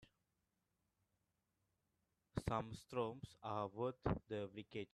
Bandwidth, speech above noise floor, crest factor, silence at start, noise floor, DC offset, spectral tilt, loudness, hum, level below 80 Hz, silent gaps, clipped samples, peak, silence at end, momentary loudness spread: 13 kHz; 42 dB; 24 dB; 0 s; -88 dBFS; under 0.1%; -7 dB/octave; -46 LUFS; none; -64 dBFS; none; under 0.1%; -24 dBFS; 0.1 s; 7 LU